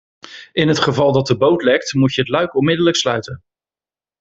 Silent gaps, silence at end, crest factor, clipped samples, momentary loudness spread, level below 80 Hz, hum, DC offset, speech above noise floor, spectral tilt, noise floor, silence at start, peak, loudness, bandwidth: none; 0.85 s; 16 dB; under 0.1%; 10 LU; -52 dBFS; none; under 0.1%; over 75 dB; -5 dB/octave; under -90 dBFS; 0.3 s; -2 dBFS; -16 LUFS; 8 kHz